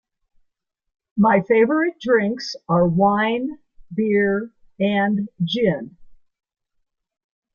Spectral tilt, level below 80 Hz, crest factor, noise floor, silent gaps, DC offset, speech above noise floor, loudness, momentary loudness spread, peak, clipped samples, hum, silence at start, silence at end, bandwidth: -7 dB/octave; -58 dBFS; 18 dB; -73 dBFS; none; under 0.1%; 54 dB; -20 LUFS; 13 LU; -4 dBFS; under 0.1%; none; 1.15 s; 1.4 s; 7 kHz